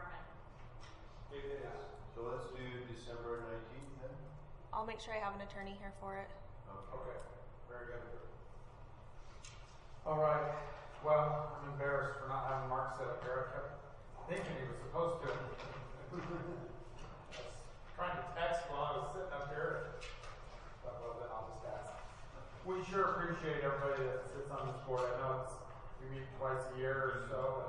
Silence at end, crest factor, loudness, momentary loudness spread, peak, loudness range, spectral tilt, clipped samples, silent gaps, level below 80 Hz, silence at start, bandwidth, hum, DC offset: 0 s; 22 dB; -42 LUFS; 18 LU; -20 dBFS; 10 LU; -6 dB/octave; under 0.1%; none; -58 dBFS; 0 s; 11 kHz; none; under 0.1%